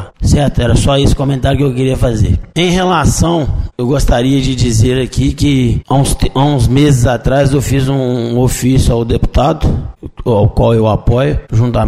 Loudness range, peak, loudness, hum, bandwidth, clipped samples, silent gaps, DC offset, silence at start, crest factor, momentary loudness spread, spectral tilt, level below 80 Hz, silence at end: 1 LU; 0 dBFS; -12 LUFS; none; 15 kHz; under 0.1%; none; 0.6%; 0 s; 10 dB; 4 LU; -6 dB/octave; -20 dBFS; 0 s